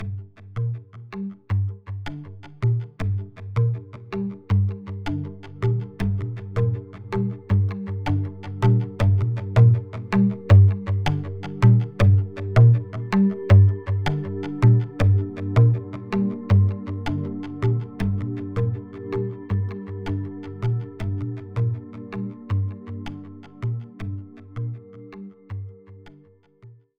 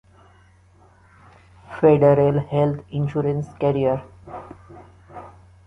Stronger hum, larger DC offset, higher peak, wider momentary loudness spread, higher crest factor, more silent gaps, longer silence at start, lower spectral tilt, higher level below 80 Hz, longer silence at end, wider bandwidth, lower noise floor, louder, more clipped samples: neither; neither; about the same, -4 dBFS vs -2 dBFS; second, 18 LU vs 26 LU; about the same, 18 dB vs 20 dB; neither; second, 0 s vs 1.7 s; about the same, -9 dB/octave vs -10 dB/octave; first, -44 dBFS vs -50 dBFS; about the same, 0.25 s vs 0.35 s; about the same, 6.2 kHz vs 6.2 kHz; about the same, -53 dBFS vs -53 dBFS; second, -23 LUFS vs -20 LUFS; neither